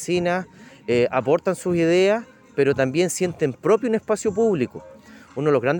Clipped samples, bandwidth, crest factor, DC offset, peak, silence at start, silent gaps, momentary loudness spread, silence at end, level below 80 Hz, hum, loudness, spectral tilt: under 0.1%; 17 kHz; 16 dB; under 0.1%; -6 dBFS; 0 s; none; 10 LU; 0 s; -60 dBFS; none; -21 LUFS; -5.5 dB/octave